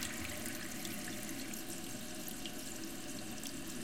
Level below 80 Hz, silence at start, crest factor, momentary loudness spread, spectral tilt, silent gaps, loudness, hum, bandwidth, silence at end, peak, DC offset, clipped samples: -62 dBFS; 0 s; 20 dB; 3 LU; -2.5 dB/octave; none; -43 LUFS; none; 17 kHz; 0 s; -24 dBFS; 0.4%; under 0.1%